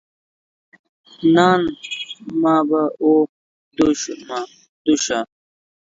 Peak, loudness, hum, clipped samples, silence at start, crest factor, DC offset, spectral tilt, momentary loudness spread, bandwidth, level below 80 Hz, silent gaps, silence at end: -2 dBFS; -19 LUFS; none; under 0.1%; 1.2 s; 18 dB; under 0.1%; -4.5 dB/octave; 14 LU; 7.8 kHz; -58 dBFS; 3.29-3.71 s, 4.69-4.85 s; 0.6 s